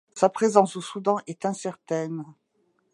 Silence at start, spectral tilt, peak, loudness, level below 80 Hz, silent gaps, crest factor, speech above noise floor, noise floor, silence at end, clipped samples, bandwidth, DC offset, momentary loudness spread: 0.15 s; -5.5 dB/octave; -2 dBFS; -25 LUFS; -78 dBFS; none; 24 dB; 45 dB; -70 dBFS; 0.6 s; under 0.1%; 11.5 kHz; under 0.1%; 13 LU